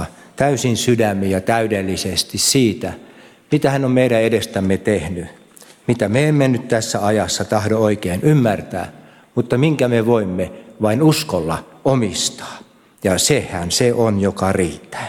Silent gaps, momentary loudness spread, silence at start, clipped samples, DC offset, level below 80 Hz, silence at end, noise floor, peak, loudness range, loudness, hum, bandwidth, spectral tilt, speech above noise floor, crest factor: none; 11 LU; 0 s; under 0.1%; under 0.1%; -48 dBFS; 0 s; -45 dBFS; -4 dBFS; 1 LU; -17 LUFS; none; 18 kHz; -5 dB/octave; 28 dB; 14 dB